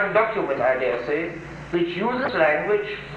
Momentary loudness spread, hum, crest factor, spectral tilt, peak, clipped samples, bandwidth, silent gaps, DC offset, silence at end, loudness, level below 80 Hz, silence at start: 7 LU; none; 16 dB; -7 dB/octave; -6 dBFS; under 0.1%; 8.2 kHz; none; under 0.1%; 0 s; -23 LUFS; -52 dBFS; 0 s